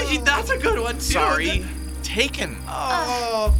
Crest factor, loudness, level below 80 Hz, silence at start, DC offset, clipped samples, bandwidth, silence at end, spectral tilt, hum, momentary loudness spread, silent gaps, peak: 18 dB; -22 LUFS; -28 dBFS; 0 s; under 0.1%; under 0.1%; 18 kHz; 0 s; -3.5 dB/octave; none; 9 LU; none; -2 dBFS